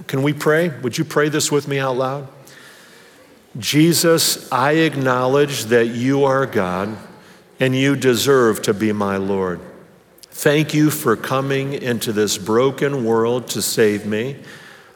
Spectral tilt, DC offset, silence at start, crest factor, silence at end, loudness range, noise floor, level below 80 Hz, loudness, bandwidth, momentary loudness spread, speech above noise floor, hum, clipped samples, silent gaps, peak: -4.5 dB/octave; under 0.1%; 0 s; 18 dB; 0.25 s; 3 LU; -47 dBFS; -66 dBFS; -18 LUFS; over 20 kHz; 10 LU; 30 dB; none; under 0.1%; none; -2 dBFS